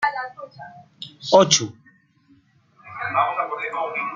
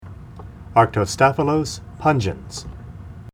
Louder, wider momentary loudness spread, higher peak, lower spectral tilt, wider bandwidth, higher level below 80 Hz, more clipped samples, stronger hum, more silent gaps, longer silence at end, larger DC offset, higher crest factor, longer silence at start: about the same, -20 LUFS vs -19 LUFS; about the same, 24 LU vs 22 LU; about the same, -2 dBFS vs 0 dBFS; second, -2.5 dB/octave vs -5.5 dB/octave; second, 9.6 kHz vs 16 kHz; second, -68 dBFS vs -42 dBFS; neither; neither; neither; about the same, 0 s vs 0.05 s; neither; about the same, 22 dB vs 20 dB; about the same, 0 s vs 0.05 s